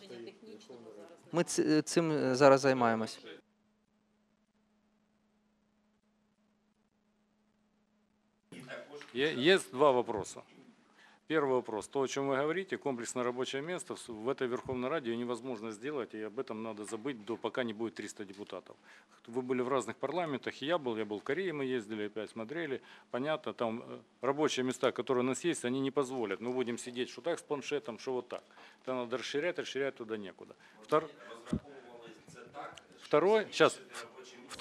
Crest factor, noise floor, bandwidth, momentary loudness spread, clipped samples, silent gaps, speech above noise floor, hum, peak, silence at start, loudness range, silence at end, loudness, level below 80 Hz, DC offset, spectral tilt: 26 dB; -75 dBFS; 14 kHz; 20 LU; under 0.1%; none; 41 dB; none; -10 dBFS; 0 s; 9 LU; 0 s; -34 LUFS; -72 dBFS; under 0.1%; -4.5 dB/octave